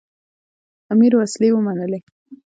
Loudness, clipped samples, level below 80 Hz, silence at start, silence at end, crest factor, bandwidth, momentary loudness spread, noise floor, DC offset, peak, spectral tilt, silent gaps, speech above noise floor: -17 LUFS; under 0.1%; -68 dBFS; 0.9 s; 0.2 s; 14 dB; 9.2 kHz; 12 LU; under -90 dBFS; under 0.1%; -4 dBFS; -6.5 dB/octave; 2.03-2.26 s; over 74 dB